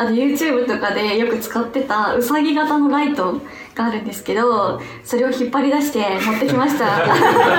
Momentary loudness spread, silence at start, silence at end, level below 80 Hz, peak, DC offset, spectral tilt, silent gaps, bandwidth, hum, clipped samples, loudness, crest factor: 7 LU; 0 s; 0 s; -58 dBFS; 0 dBFS; under 0.1%; -4.5 dB/octave; none; 19.5 kHz; none; under 0.1%; -18 LUFS; 16 dB